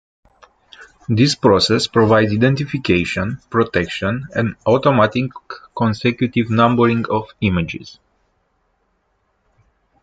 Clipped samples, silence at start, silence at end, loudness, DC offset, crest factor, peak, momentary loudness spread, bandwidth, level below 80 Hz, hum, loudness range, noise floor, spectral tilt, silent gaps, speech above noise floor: under 0.1%; 0.8 s; 2.1 s; -17 LUFS; under 0.1%; 16 dB; -2 dBFS; 9 LU; 9.2 kHz; -50 dBFS; none; 4 LU; -65 dBFS; -6 dB/octave; none; 49 dB